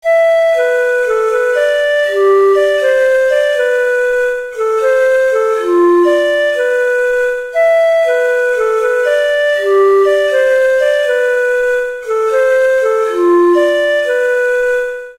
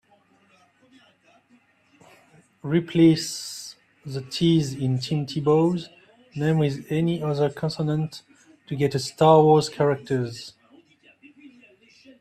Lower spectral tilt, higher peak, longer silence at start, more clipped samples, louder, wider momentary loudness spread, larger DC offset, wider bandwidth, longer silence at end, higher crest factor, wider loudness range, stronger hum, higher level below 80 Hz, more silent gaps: second, -2 dB/octave vs -6.5 dB/octave; about the same, -2 dBFS vs -4 dBFS; second, 0.05 s vs 2.65 s; neither; first, -12 LUFS vs -23 LUFS; second, 4 LU vs 19 LU; neither; about the same, 14.5 kHz vs 14 kHz; second, 0.05 s vs 1.7 s; second, 8 dB vs 20 dB; second, 1 LU vs 4 LU; neither; first, -50 dBFS vs -60 dBFS; neither